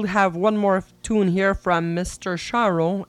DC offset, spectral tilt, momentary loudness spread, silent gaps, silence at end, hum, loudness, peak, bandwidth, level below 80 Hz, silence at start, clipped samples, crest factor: under 0.1%; -6 dB/octave; 7 LU; none; 0.05 s; none; -21 LUFS; -6 dBFS; 12.5 kHz; -44 dBFS; 0 s; under 0.1%; 16 dB